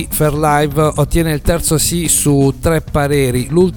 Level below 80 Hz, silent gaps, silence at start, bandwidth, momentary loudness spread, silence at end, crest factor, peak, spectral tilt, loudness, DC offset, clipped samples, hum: -26 dBFS; none; 0 s; 19 kHz; 4 LU; 0 s; 14 dB; 0 dBFS; -5 dB/octave; -13 LUFS; under 0.1%; under 0.1%; none